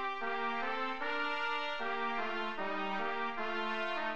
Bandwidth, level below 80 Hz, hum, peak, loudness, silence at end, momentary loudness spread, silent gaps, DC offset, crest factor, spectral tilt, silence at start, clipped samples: 9 kHz; -72 dBFS; none; -22 dBFS; -36 LUFS; 0 s; 2 LU; none; 0.6%; 14 dB; -4 dB/octave; 0 s; under 0.1%